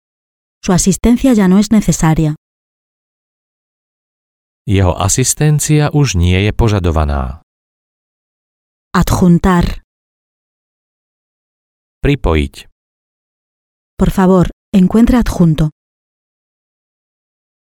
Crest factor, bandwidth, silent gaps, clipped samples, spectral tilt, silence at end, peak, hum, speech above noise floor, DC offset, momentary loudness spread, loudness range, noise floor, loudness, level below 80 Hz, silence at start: 14 dB; 17.5 kHz; 2.38-4.65 s, 7.43-8.91 s, 9.84-12.01 s, 12.72-13.97 s, 14.53-14.72 s; under 0.1%; -6 dB/octave; 2 s; 0 dBFS; none; over 79 dB; under 0.1%; 9 LU; 7 LU; under -90 dBFS; -12 LUFS; -26 dBFS; 0.65 s